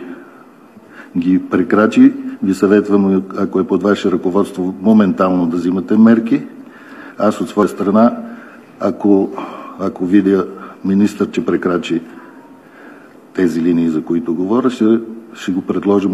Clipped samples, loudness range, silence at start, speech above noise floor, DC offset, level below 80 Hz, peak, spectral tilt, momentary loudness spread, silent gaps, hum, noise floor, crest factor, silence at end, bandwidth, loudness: under 0.1%; 4 LU; 0 s; 28 dB; under 0.1%; -62 dBFS; 0 dBFS; -7.5 dB/octave; 14 LU; none; none; -41 dBFS; 14 dB; 0 s; 12 kHz; -15 LUFS